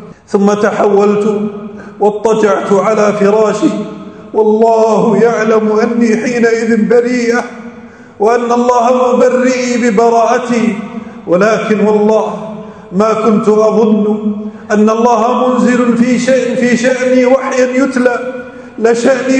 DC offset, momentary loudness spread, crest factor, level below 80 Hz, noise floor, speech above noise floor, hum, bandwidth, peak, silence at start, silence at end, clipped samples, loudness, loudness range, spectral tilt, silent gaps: under 0.1%; 11 LU; 10 dB; -54 dBFS; -33 dBFS; 23 dB; none; 9.2 kHz; 0 dBFS; 0 s; 0 s; 0.4%; -10 LUFS; 2 LU; -6 dB/octave; none